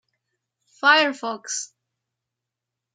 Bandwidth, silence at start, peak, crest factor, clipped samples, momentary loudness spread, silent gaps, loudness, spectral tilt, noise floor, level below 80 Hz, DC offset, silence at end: 9.6 kHz; 0.85 s; -4 dBFS; 22 dB; under 0.1%; 14 LU; none; -21 LUFS; 0 dB/octave; -85 dBFS; -88 dBFS; under 0.1%; 1.3 s